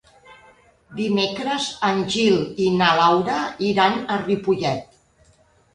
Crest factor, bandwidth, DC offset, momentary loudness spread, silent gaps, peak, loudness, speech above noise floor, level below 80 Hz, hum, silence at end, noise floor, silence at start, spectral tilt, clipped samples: 20 dB; 11 kHz; under 0.1%; 7 LU; none; -2 dBFS; -20 LUFS; 37 dB; -56 dBFS; none; 0.9 s; -57 dBFS; 0.3 s; -5 dB/octave; under 0.1%